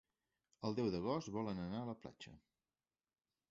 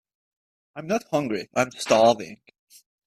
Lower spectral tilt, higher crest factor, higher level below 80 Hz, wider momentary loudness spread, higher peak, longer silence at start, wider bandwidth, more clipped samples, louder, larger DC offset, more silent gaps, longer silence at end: first, -6.5 dB/octave vs -4 dB/octave; about the same, 20 dB vs 20 dB; about the same, -70 dBFS vs -66 dBFS; second, 16 LU vs 21 LU; second, -26 dBFS vs -6 dBFS; second, 0.6 s vs 0.75 s; second, 7.6 kHz vs 14.5 kHz; neither; second, -43 LUFS vs -23 LUFS; neither; neither; first, 1.15 s vs 0.75 s